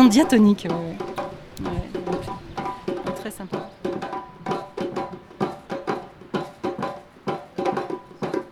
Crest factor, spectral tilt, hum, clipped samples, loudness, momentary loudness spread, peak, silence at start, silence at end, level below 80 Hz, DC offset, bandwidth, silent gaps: 22 dB; -6 dB/octave; none; under 0.1%; -26 LUFS; 14 LU; -4 dBFS; 0 s; 0 s; -48 dBFS; under 0.1%; 15.5 kHz; none